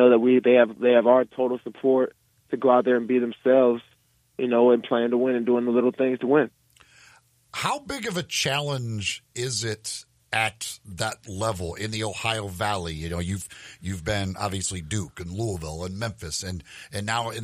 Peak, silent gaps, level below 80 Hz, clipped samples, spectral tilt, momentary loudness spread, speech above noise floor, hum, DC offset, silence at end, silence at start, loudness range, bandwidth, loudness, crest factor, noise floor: -4 dBFS; none; -54 dBFS; under 0.1%; -4.5 dB/octave; 13 LU; 33 dB; none; under 0.1%; 0 s; 0 s; 8 LU; 15.5 kHz; -24 LUFS; 20 dB; -57 dBFS